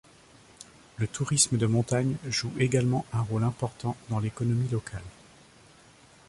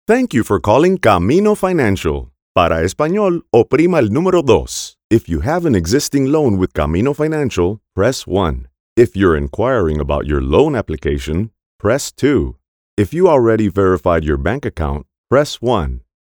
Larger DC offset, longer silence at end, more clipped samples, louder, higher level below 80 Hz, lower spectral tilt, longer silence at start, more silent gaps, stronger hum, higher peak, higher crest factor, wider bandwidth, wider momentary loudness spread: neither; first, 1.2 s vs 0.3 s; neither; second, -28 LUFS vs -15 LUFS; second, -56 dBFS vs -30 dBFS; about the same, -5 dB/octave vs -6 dB/octave; first, 0.6 s vs 0.1 s; second, none vs 2.42-2.55 s, 5.04-5.10 s, 8.80-8.96 s, 11.66-11.79 s, 12.68-12.97 s, 15.18-15.24 s; neither; second, -8 dBFS vs 0 dBFS; first, 22 dB vs 14 dB; second, 11.5 kHz vs 19 kHz; first, 20 LU vs 9 LU